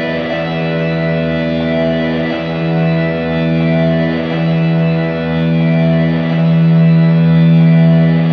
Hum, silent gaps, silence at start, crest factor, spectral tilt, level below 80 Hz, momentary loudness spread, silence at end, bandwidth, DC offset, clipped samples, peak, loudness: none; none; 0 s; 10 dB; -10 dB/octave; -40 dBFS; 7 LU; 0 s; 5 kHz; under 0.1%; under 0.1%; -2 dBFS; -13 LUFS